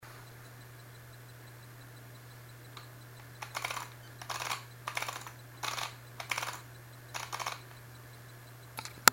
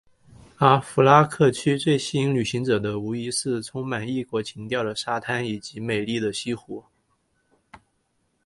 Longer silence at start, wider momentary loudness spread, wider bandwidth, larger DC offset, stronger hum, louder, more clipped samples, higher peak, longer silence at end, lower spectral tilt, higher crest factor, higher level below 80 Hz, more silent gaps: second, 0 s vs 0.6 s; about the same, 14 LU vs 13 LU; first, 16.5 kHz vs 11.5 kHz; neither; neither; second, -38 LUFS vs -23 LUFS; neither; about the same, 0 dBFS vs 0 dBFS; second, 0 s vs 0.7 s; second, -1.5 dB/octave vs -5.5 dB/octave; first, 40 dB vs 24 dB; second, -68 dBFS vs -60 dBFS; neither